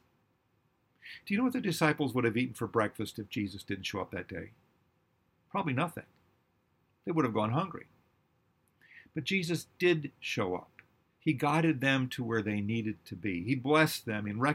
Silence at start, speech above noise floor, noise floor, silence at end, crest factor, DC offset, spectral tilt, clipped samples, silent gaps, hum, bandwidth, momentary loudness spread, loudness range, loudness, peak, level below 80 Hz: 1.05 s; 42 dB; -74 dBFS; 0 s; 22 dB; under 0.1%; -5.5 dB/octave; under 0.1%; none; none; 16.5 kHz; 12 LU; 7 LU; -32 LUFS; -12 dBFS; -70 dBFS